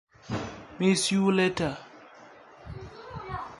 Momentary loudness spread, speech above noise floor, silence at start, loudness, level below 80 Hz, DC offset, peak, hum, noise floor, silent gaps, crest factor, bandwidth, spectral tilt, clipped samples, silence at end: 20 LU; 26 dB; 0.25 s; -27 LUFS; -54 dBFS; under 0.1%; -10 dBFS; none; -51 dBFS; none; 20 dB; 11.5 kHz; -4.5 dB/octave; under 0.1%; 0 s